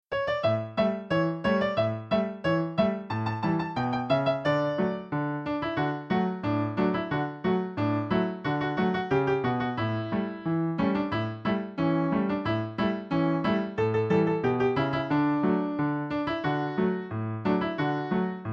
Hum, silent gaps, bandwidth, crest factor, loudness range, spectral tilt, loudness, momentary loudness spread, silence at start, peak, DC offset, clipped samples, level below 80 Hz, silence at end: none; none; 7 kHz; 16 dB; 2 LU; -8.5 dB/octave; -28 LUFS; 4 LU; 0.1 s; -12 dBFS; under 0.1%; under 0.1%; -56 dBFS; 0 s